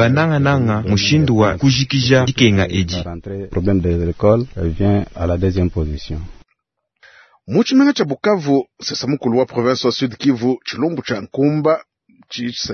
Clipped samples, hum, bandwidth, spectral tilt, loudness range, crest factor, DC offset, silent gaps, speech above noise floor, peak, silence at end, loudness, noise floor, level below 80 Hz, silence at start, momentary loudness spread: under 0.1%; none; 6.6 kHz; -6 dB/octave; 4 LU; 16 dB; under 0.1%; none; 56 dB; 0 dBFS; 0 s; -17 LUFS; -72 dBFS; -38 dBFS; 0 s; 11 LU